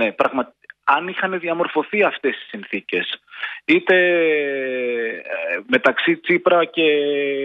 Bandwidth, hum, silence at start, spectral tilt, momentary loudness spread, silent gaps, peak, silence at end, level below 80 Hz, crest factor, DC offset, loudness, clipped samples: 6.4 kHz; none; 0 s; -6.5 dB/octave; 11 LU; none; -2 dBFS; 0 s; -70 dBFS; 16 dB; under 0.1%; -19 LUFS; under 0.1%